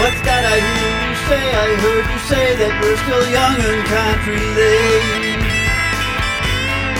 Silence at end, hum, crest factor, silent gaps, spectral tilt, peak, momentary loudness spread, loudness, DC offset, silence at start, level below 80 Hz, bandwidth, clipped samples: 0 s; none; 14 dB; none; -4 dB/octave; 0 dBFS; 4 LU; -15 LUFS; under 0.1%; 0 s; -26 dBFS; 17 kHz; under 0.1%